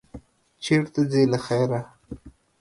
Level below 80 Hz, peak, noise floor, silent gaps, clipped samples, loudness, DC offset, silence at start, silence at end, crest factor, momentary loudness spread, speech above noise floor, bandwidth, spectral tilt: -54 dBFS; -8 dBFS; -46 dBFS; none; under 0.1%; -23 LUFS; under 0.1%; 0.15 s; 0.3 s; 16 dB; 22 LU; 24 dB; 11.5 kHz; -6.5 dB/octave